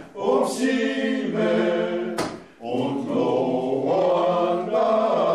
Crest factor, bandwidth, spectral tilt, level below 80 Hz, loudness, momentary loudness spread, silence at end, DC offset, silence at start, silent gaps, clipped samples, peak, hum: 12 dB; 13 kHz; -5.5 dB/octave; -66 dBFS; -23 LUFS; 7 LU; 0 s; under 0.1%; 0 s; none; under 0.1%; -10 dBFS; none